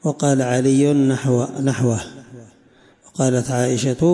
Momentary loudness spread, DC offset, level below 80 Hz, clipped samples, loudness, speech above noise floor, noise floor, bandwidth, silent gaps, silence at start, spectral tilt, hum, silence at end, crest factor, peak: 6 LU; under 0.1%; -54 dBFS; under 0.1%; -18 LUFS; 35 dB; -52 dBFS; 11.5 kHz; none; 0.05 s; -6 dB/octave; none; 0 s; 12 dB; -6 dBFS